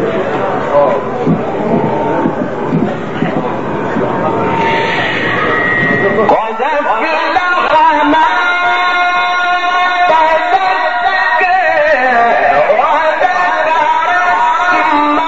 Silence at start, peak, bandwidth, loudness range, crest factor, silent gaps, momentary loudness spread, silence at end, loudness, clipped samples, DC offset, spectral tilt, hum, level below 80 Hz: 0 s; 0 dBFS; 8 kHz; 4 LU; 12 dB; none; 6 LU; 0 s; -11 LUFS; under 0.1%; 3%; -3 dB/octave; none; -44 dBFS